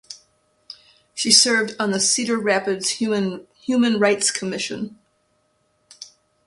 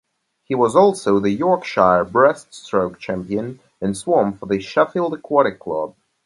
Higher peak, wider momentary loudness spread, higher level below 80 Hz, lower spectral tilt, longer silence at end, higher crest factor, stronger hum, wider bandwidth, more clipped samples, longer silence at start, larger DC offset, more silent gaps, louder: about the same, 0 dBFS vs 0 dBFS; first, 24 LU vs 11 LU; second, -66 dBFS vs -54 dBFS; second, -2 dB/octave vs -6 dB/octave; about the same, 0.4 s vs 0.35 s; about the same, 22 dB vs 18 dB; neither; about the same, 11.5 kHz vs 11.5 kHz; neither; second, 0.1 s vs 0.5 s; neither; neither; about the same, -19 LUFS vs -19 LUFS